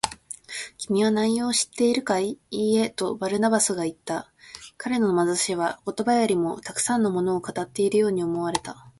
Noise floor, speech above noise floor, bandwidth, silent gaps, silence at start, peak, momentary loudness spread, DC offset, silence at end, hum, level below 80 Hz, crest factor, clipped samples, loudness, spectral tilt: -43 dBFS; 19 dB; 12 kHz; none; 0.05 s; -2 dBFS; 11 LU; under 0.1%; 0.1 s; none; -62 dBFS; 22 dB; under 0.1%; -24 LUFS; -4 dB/octave